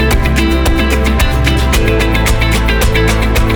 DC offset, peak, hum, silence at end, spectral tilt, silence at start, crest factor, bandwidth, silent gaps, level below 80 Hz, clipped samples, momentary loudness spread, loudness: under 0.1%; -2 dBFS; none; 0 s; -5 dB/octave; 0 s; 10 dB; over 20 kHz; none; -12 dBFS; under 0.1%; 1 LU; -12 LUFS